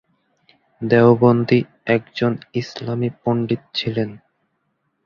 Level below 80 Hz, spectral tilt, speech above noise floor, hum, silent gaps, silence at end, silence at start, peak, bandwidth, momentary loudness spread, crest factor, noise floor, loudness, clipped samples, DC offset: -56 dBFS; -8 dB/octave; 52 dB; none; none; 0.9 s; 0.8 s; -2 dBFS; 6.8 kHz; 13 LU; 18 dB; -70 dBFS; -19 LUFS; under 0.1%; under 0.1%